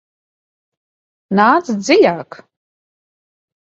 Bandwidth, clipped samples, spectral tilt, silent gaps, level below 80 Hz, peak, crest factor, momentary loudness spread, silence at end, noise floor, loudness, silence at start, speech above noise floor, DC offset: 7.8 kHz; under 0.1%; -5 dB/octave; none; -64 dBFS; 0 dBFS; 18 dB; 7 LU; 1.45 s; under -90 dBFS; -13 LUFS; 1.3 s; over 77 dB; under 0.1%